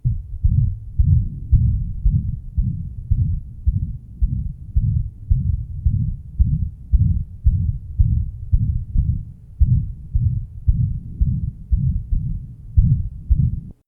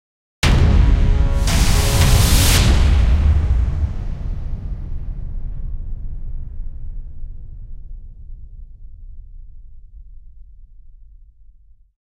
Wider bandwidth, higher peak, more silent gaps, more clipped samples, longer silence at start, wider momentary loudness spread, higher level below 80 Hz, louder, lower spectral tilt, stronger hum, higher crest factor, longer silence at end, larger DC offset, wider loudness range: second, 0.6 kHz vs 16 kHz; about the same, 0 dBFS vs -2 dBFS; neither; neither; second, 0.05 s vs 0.45 s; second, 7 LU vs 24 LU; about the same, -22 dBFS vs -20 dBFS; second, -22 LUFS vs -17 LUFS; first, -13.5 dB/octave vs -4.5 dB/octave; neither; about the same, 18 dB vs 16 dB; second, 0.15 s vs 0.8 s; neither; second, 2 LU vs 23 LU